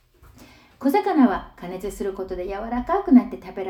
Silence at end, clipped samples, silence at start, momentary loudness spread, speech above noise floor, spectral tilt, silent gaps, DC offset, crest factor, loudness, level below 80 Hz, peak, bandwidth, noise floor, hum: 0 s; under 0.1%; 0.4 s; 15 LU; 28 dB; -6.5 dB/octave; none; under 0.1%; 20 dB; -22 LUFS; -46 dBFS; -4 dBFS; 15 kHz; -50 dBFS; none